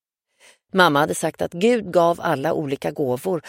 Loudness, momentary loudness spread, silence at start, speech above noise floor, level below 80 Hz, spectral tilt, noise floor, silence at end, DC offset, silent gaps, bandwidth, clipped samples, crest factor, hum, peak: -20 LUFS; 8 LU; 0.75 s; 36 dB; -60 dBFS; -5 dB/octave; -56 dBFS; 0 s; under 0.1%; none; 16.5 kHz; under 0.1%; 20 dB; none; 0 dBFS